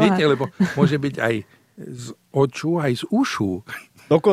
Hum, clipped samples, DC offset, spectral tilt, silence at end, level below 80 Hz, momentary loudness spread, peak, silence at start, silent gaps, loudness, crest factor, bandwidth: none; under 0.1%; under 0.1%; -6.5 dB/octave; 0 s; -58 dBFS; 17 LU; -2 dBFS; 0 s; none; -21 LUFS; 18 dB; 15 kHz